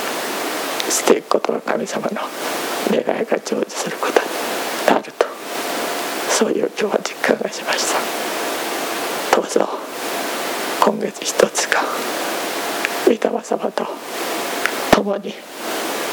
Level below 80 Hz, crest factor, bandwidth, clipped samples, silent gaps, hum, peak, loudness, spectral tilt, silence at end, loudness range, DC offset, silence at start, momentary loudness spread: -58 dBFS; 20 dB; over 20 kHz; under 0.1%; none; none; 0 dBFS; -20 LUFS; -2.5 dB/octave; 0 s; 1 LU; under 0.1%; 0 s; 7 LU